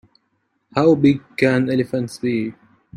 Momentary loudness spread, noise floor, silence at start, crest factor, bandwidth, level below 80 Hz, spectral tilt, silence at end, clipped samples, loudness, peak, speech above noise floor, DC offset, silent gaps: 10 LU; -69 dBFS; 0.75 s; 18 dB; 12 kHz; -56 dBFS; -7.5 dB/octave; 0 s; under 0.1%; -19 LUFS; -2 dBFS; 51 dB; under 0.1%; none